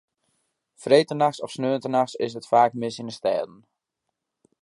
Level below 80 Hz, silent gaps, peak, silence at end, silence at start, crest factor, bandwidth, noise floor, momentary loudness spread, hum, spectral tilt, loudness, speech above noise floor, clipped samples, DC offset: -74 dBFS; none; -4 dBFS; 1.15 s; 0.8 s; 22 dB; 11.5 kHz; -82 dBFS; 11 LU; none; -5.5 dB/octave; -23 LUFS; 59 dB; under 0.1%; under 0.1%